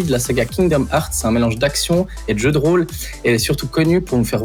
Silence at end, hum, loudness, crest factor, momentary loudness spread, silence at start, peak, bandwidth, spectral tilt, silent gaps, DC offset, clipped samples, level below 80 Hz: 0 s; none; -17 LUFS; 12 dB; 3 LU; 0 s; -4 dBFS; 20 kHz; -5 dB/octave; none; under 0.1%; under 0.1%; -32 dBFS